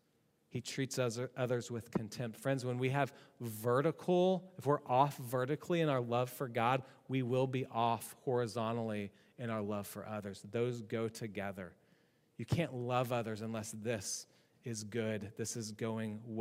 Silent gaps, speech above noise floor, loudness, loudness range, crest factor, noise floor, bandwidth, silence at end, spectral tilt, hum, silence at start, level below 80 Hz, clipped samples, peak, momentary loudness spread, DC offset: none; 38 dB; -37 LUFS; 7 LU; 20 dB; -75 dBFS; 16 kHz; 0 s; -5.5 dB/octave; none; 0.55 s; -74 dBFS; under 0.1%; -16 dBFS; 11 LU; under 0.1%